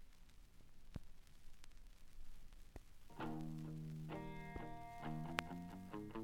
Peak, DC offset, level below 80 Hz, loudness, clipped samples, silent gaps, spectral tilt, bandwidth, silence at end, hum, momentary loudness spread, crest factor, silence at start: -16 dBFS; under 0.1%; -60 dBFS; -50 LUFS; under 0.1%; none; -6 dB/octave; 16.5 kHz; 0 s; none; 22 LU; 34 dB; 0 s